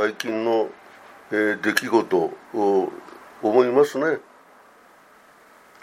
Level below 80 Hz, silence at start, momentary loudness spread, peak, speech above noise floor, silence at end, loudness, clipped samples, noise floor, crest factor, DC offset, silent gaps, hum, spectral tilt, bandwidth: -74 dBFS; 0 s; 12 LU; 0 dBFS; 30 dB; 1.6 s; -22 LUFS; under 0.1%; -52 dBFS; 24 dB; under 0.1%; none; none; -4.5 dB/octave; 15.5 kHz